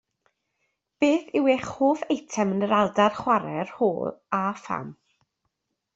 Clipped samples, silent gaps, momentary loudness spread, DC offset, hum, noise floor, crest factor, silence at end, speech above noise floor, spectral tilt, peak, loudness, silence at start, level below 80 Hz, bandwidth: under 0.1%; none; 10 LU; under 0.1%; none; -79 dBFS; 20 dB; 1.05 s; 54 dB; -5.5 dB/octave; -6 dBFS; -25 LUFS; 1 s; -66 dBFS; 8 kHz